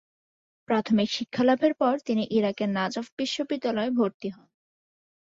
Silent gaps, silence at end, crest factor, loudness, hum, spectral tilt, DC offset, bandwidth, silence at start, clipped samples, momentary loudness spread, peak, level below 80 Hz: 3.12-3.17 s, 4.14-4.20 s; 0.95 s; 18 dB; -26 LUFS; none; -5.5 dB/octave; under 0.1%; 7.8 kHz; 0.7 s; under 0.1%; 7 LU; -10 dBFS; -68 dBFS